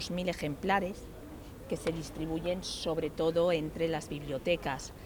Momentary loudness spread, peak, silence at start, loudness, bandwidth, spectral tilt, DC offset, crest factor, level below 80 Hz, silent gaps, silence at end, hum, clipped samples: 13 LU; -14 dBFS; 0 s; -33 LUFS; over 20 kHz; -5 dB/octave; under 0.1%; 20 dB; -52 dBFS; none; 0 s; none; under 0.1%